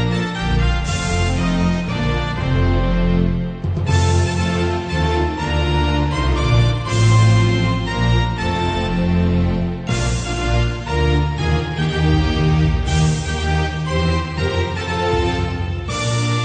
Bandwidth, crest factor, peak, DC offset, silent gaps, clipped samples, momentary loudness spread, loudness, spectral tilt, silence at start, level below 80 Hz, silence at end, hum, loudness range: 9.4 kHz; 14 dB; -4 dBFS; under 0.1%; none; under 0.1%; 5 LU; -18 LUFS; -6 dB/octave; 0 s; -24 dBFS; 0 s; none; 3 LU